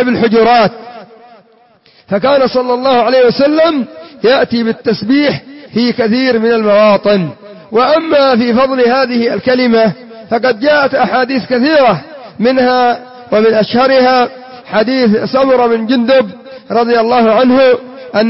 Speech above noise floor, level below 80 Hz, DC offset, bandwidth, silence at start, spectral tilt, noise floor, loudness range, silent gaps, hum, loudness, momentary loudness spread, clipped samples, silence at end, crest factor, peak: 37 dB; -50 dBFS; under 0.1%; 5.8 kHz; 0 s; -9 dB/octave; -47 dBFS; 2 LU; none; none; -10 LUFS; 9 LU; under 0.1%; 0 s; 10 dB; 0 dBFS